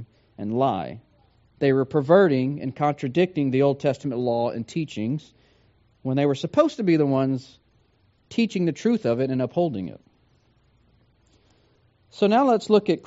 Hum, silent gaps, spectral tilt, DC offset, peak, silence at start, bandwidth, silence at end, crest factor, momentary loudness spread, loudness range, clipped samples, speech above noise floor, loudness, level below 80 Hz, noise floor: none; none; -6.5 dB/octave; under 0.1%; -4 dBFS; 0 s; 8 kHz; 0.05 s; 20 dB; 11 LU; 5 LU; under 0.1%; 41 dB; -23 LUFS; -64 dBFS; -63 dBFS